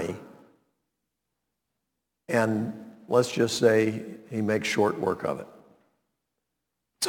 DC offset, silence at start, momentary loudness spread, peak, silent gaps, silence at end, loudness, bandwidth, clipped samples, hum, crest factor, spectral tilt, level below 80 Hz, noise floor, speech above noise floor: under 0.1%; 0 s; 15 LU; -8 dBFS; none; 0 s; -26 LUFS; 18.5 kHz; under 0.1%; none; 22 dB; -4.5 dB/octave; -70 dBFS; -83 dBFS; 58 dB